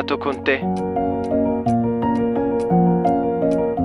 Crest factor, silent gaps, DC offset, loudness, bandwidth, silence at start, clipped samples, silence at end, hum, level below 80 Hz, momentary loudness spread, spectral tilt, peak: 14 dB; none; under 0.1%; -20 LUFS; 10.5 kHz; 0 s; under 0.1%; 0 s; none; -44 dBFS; 5 LU; -8.5 dB/octave; -4 dBFS